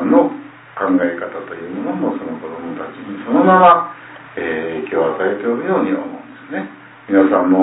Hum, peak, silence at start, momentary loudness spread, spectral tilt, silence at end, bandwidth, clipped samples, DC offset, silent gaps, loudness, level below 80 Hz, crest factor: none; 0 dBFS; 0 s; 17 LU; -11 dB/octave; 0 s; 4 kHz; under 0.1%; under 0.1%; none; -16 LUFS; -60 dBFS; 16 dB